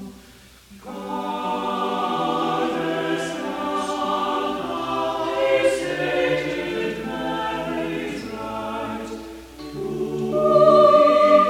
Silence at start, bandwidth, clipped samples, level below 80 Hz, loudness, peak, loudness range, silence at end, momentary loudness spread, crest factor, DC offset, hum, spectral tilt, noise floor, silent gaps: 0 s; 16 kHz; under 0.1%; -52 dBFS; -22 LUFS; -2 dBFS; 8 LU; 0 s; 17 LU; 18 dB; under 0.1%; none; -5 dB/octave; -48 dBFS; none